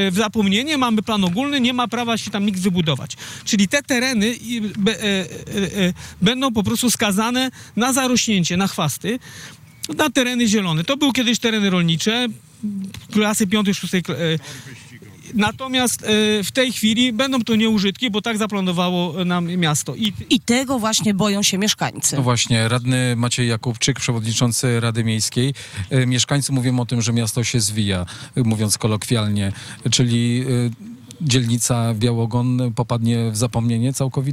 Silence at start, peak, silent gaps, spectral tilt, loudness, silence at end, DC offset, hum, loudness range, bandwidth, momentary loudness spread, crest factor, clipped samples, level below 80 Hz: 0 s; -8 dBFS; none; -4.5 dB/octave; -19 LUFS; 0 s; under 0.1%; none; 2 LU; 16 kHz; 7 LU; 12 dB; under 0.1%; -52 dBFS